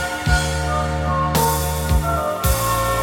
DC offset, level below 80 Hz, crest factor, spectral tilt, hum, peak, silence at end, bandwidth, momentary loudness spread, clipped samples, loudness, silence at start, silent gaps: under 0.1%; -24 dBFS; 16 dB; -4.5 dB/octave; none; -4 dBFS; 0 s; 19.5 kHz; 3 LU; under 0.1%; -19 LUFS; 0 s; none